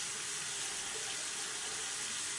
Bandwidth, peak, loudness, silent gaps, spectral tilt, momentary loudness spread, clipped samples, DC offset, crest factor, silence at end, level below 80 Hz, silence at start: 11.5 kHz; -26 dBFS; -37 LUFS; none; 1 dB/octave; 1 LU; under 0.1%; under 0.1%; 14 dB; 0 s; -72 dBFS; 0 s